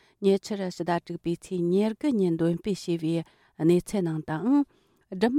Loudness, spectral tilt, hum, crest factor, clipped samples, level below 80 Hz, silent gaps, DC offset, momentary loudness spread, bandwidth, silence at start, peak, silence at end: -27 LUFS; -7 dB/octave; none; 16 dB; under 0.1%; -60 dBFS; none; under 0.1%; 8 LU; 14.5 kHz; 0.2 s; -10 dBFS; 0 s